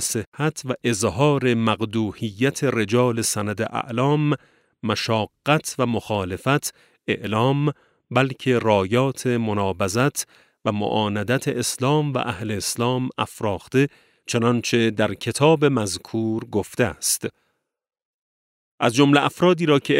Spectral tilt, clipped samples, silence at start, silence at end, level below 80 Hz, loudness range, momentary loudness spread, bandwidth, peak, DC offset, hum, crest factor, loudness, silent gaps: -5 dB/octave; under 0.1%; 0 s; 0 s; -58 dBFS; 2 LU; 8 LU; 16 kHz; -2 dBFS; under 0.1%; none; 20 dB; -22 LUFS; 0.27-0.32 s, 18.05-18.78 s